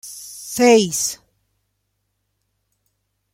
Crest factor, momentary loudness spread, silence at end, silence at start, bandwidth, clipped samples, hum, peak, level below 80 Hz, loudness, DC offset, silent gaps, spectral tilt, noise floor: 20 dB; 20 LU; 2.2 s; 0.05 s; 16.5 kHz; under 0.1%; 50 Hz at -60 dBFS; -2 dBFS; -62 dBFS; -16 LUFS; under 0.1%; none; -3 dB/octave; -72 dBFS